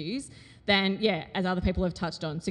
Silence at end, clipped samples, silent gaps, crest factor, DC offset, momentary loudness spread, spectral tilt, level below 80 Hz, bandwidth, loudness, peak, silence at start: 0 s; under 0.1%; none; 18 dB; under 0.1%; 12 LU; -5.5 dB/octave; -44 dBFS; 11 kHz; -28 LUFS; -10 dBFS; 0 s